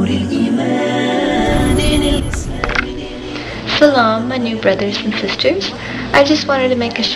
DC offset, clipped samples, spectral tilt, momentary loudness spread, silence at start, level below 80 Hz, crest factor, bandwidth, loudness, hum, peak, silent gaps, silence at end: under 0.1%; under 0.1%; -5 dB/octave; 11 LU; 0 s; -28 dBFS; 14 dB; 16 kHz; -15 LUFS; none; 0 dBFS; none; 0 s